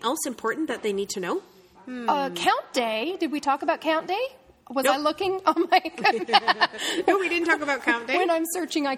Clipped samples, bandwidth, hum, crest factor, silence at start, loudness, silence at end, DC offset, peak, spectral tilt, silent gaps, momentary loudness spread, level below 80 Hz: under 0.1%; 16.5 kHz; none; 22 dB; 0 s; -24 LUFS; 0 s; under 0.1%; -4 dBFS; -2.5 dB/octave; none; 8 LU; -68 dBFS